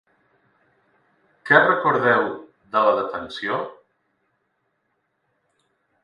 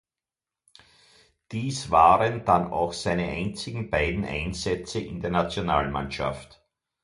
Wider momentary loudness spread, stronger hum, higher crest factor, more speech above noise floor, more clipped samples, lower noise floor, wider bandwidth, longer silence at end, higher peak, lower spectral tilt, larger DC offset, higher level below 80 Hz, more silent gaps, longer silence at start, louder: first, 17 LU vs 13 LU; neither; about the same, 22 dB vs 22 dB; second, 53 dB vs over 65 dB; neither; second, -72 dBFS vs under -90 dBFS; about the same, 11 kHz vs 11.5 kHz; first, 2.3 s vs 0.6 s; about the same, -2 dBFS vs -4 dBFS; about the same, -6.5 dB/octave vs -5.5 dB/octave; neither; second, -68 dBFS vs -44 dBFS; neither; about the same, 1.45 s vs 1.5 s; first, -20 LUFS vs -25 LUFS